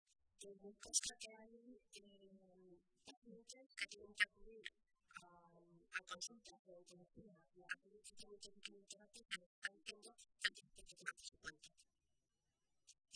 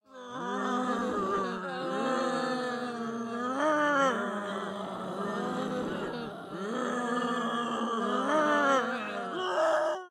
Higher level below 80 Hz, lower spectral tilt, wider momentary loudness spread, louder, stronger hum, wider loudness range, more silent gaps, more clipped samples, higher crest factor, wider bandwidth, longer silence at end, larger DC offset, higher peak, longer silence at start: second, -80 dBFS vs -70 dBFS; second, 0.5 dB/octave vs -4.5 dB/octave; first, 25 LU vs 10 LU; second, -48 LUFS vs -31 LUFS; neither; first, 7 LU vs 4 LU; first, 3.17-3.22 s, 6.59-6.65 s, 9.46-9.62 s vs none; neither; first, 32 dB vs 16 dB; second, 11 kHz vs 15 kHz; about the same, 0 s vs 0 s; neither; second, -22 dBFS vs -14 dBFS; first, 0.4 s vs 0.1 s